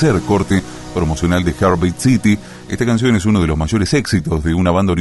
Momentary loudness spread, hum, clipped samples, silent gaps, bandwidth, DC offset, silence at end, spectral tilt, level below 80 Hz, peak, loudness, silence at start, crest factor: 6 LU; none; under 0.1%; none; 12 kHz; under 0.1%; 0 s; -6 dB/octave; -30 dBFS; -2 dBFS; -16 LUFS; 0 s; 14 dB